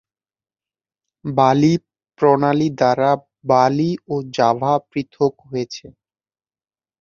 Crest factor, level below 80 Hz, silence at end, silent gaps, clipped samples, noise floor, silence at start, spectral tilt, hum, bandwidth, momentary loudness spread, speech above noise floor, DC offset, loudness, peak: 18 dB; -60 dBFS; 1.1 s; none; under 0.1%; under -90 dBFS; 1.25 s; -7 dB/octave; none; 7.4 kHz; 12 LU; over 73 dB; under 0.1%; -18 LUFS; -2 dBFS